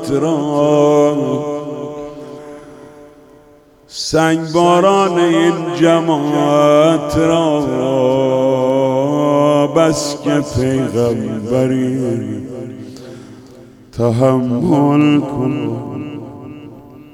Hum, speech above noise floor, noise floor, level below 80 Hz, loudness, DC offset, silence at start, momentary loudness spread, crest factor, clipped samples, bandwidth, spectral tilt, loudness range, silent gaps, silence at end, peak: none; 32 dB; -46 dBFS; -46 dBFS; -14 LUFS; under 0.1%; 0 s; 19 LU; 14 dB; under 0.1%; 15.5 kHz; -6 dB/octave; 7 LU; none; 0.1 s; 0 dBFS